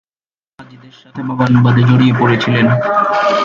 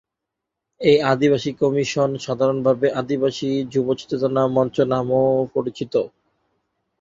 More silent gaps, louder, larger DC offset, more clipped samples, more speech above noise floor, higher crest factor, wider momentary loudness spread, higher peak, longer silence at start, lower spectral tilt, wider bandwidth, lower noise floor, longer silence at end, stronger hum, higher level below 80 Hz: neither; first, -12 LUFS vs -20 LUFS; neither; neither; first, over 78 dB vs 63 dB; second, 12 dB vs 18 dB; first, 12 LU vs 6 LU; about the same, 0 dBFS vs -2 dBFS; second, 0.6 s vs 0.8 s; first, -8 dB/octave vs -6.5 dB/octave; about the same, 7.2 kHz vs 7.8 kHz; first, under -90 dBFS vs -83 dBFS; second, 0 s vs 0.95 s; neither; first, -50 dBFS vs -58 dBFS